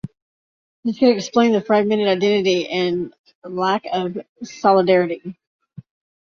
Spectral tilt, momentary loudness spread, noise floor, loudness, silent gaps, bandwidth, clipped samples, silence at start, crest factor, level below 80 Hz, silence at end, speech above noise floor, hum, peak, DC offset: -5.5 dB/octave; 15 LU; under -90 dBFS; -18 LUFS; 0.22-0.83 s, 3.19-3.24 s, 3.35-3.42 s, 4.29-4.36 s; 7.2 kHz; under 0.1%; 0.05 s; 18 dB; -62 dBFS; 0.9 s; over 72 dB; none; -2 dBFS; under 0.1%